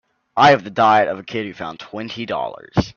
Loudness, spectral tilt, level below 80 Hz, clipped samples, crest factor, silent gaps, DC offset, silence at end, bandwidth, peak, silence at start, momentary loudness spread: -17 LUFS; -5.5 dB/octave; -46 dBFS; under 0.1%; 18 dB; none; under 0.1%; 0.05 s; 7.2 kHz; 0 dBFS; 0.35 s; 16 LU